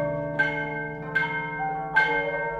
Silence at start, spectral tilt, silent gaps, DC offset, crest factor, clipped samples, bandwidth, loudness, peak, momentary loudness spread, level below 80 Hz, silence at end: 0 s; -6.5 dB/octave; none; under 0.1%; 18 dB; under 0.1%; 10.5 kHz; -26 LUFS; -8 dBFS; 7 LU; -54 dBFS; 0 s